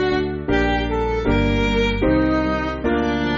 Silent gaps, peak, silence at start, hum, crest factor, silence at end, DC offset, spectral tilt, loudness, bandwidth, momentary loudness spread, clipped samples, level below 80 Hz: none; -4 dBFS; 0 s; none; 14 dB; 0 s; under 0.1%; -5 dB/octave; -20 LUFS; 7.4 kHz; 3 LU; under 0.1%; -28 dBFS